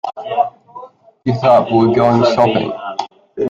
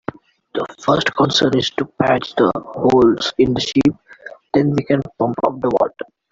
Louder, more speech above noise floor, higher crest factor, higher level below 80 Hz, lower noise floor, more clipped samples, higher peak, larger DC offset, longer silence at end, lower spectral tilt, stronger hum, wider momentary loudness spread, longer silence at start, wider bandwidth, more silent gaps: first, -14 LUFS vs -17 LUFS; about the same, 25 dB vs 23 dB; about the same, 14 dB vs 16 dB; about the same, -52 dBFS vs -50 dBFS; about the same, -37 dBFS vs -39 dBFS; neither; about the same, 0 dBFS vs -2 dBFS; neither; second, 0 s vs 0.3 s; first, -7.5 dB/octave vs -5.5 dB/octave; neither; about the same, 13 LU vs 12 LU; second, 0.05 s vs 0.55 s; about the same, 7.6 kHz vs 7.8 kHz; neither